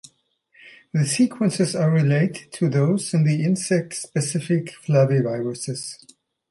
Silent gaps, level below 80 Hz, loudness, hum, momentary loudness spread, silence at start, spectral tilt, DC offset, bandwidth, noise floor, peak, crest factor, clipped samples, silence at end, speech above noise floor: none; -66 dBFS; -22 LUFS; none; 9 LU; 0.65 s; -6 dB/octave; under 0.1%; 11.5 kHz; -62 dBFS; -6 dBFS; 16 dB; under 0.1%; 0.55 s; 41 dB